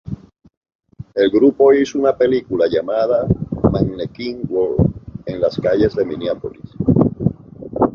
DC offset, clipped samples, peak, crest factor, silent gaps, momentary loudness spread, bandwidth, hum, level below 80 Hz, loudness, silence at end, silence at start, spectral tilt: under 0.1%; under 0.1%; -2 dBFS; 16 dB; 0.57-0.61 s, 0.75-0.79 s; 14 LU; 7 kHz; none; -38 dBFS; -17 LUFS; 0 s; 0.05 s; -8 dB/octave